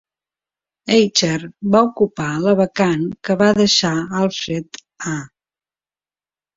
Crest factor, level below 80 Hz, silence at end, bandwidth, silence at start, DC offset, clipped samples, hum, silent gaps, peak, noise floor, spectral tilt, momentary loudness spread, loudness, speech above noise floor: 18 dB; -54 dBFS; 1.3 s; 7.8 kHz; 0.85 s; under 0.1%; under 0.1%; none; none; -2 dBFS; under -90 dBFS; -4.5 dB/octave; 12 LU; -17 LUFS; over 73 dB